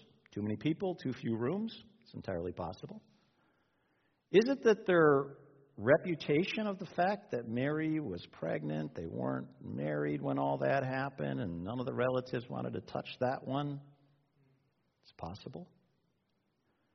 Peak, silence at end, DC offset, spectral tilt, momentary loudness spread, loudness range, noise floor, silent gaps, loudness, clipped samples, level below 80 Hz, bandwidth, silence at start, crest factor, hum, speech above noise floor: -12 dBFS; 1.3 s; under 0.1%; -5.5 dB/octave; 17 LU; 11 LU; -79 dBFS; none; -35 LUFS; under 0.1%; -72 dBFS; 6.2 kHz; 0.35 s; 22 dB; none; 45 dB